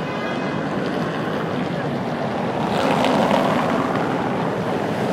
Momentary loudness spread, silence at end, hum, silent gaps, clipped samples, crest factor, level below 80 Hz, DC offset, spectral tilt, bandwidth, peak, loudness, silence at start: 6 LU; 0 s; none; none; under 0.1%; 18 dB; -52 dBFS; under 0.1%; -6.5 dB/octave; 16 kHz; -2 dBFS; -21 LUFS; 0 s